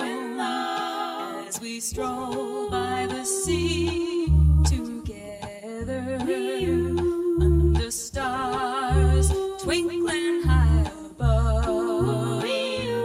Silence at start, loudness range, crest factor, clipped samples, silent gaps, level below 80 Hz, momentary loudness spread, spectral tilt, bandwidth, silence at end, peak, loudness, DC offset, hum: 0 s; 4 LU; 14 dB; under 0.1%; none; -28 dBFS; 11 LU; -5.5 dB/octave; 15 kHz; 0 s; -8 dBFS; -25 LUFS; under 0.1%; none